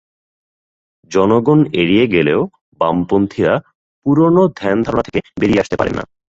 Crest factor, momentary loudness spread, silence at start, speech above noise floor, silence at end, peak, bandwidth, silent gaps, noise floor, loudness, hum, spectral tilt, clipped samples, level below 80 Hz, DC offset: 14 dB; 8 LU; 1.1 s; over 76 dB; 0.35 s; 0 dBFS; 7.8 kHz; 2.61-2.72 s, 3.75-4.02 s; under -90 dBFS; -15 LUFS; none; -7 dB/octave; under 0.1%; -44 dBFS; under 0.1%